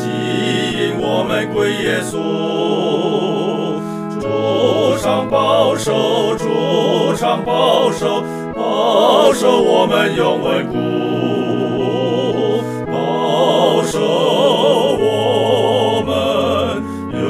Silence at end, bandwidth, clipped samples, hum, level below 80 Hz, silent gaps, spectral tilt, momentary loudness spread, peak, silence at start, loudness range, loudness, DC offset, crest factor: 0 s; 15.5 kHz; under 0.1%; none; -48 dBFS; none; -5 dB/octave; 6 LU; 0 dBFS; 0 s; 3 LU; -15 LUFS; under 0.1%; 16 dB